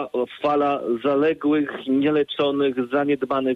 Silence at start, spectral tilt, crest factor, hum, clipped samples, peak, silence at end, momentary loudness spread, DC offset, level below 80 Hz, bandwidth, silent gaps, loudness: 0 s; -7.5 dB/octave; 12 dB; none; under 0.1%; -10 dBFS; 0 s; 3 LU; under 0.1%; -64 dBFS; 5 kHz; none; -22 LUFS